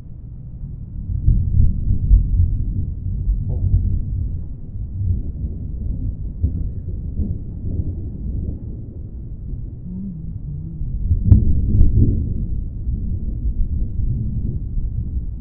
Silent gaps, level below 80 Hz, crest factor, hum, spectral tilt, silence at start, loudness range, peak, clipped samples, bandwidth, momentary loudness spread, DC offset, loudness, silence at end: none; -22 dBFS; 20 dB; none; -15 dB/octave; 0 s; 8 LU; 0 dBFS; under 0.1%; 1 kHz; 14 LU; under 0.1%; -23 LUFS; 0 s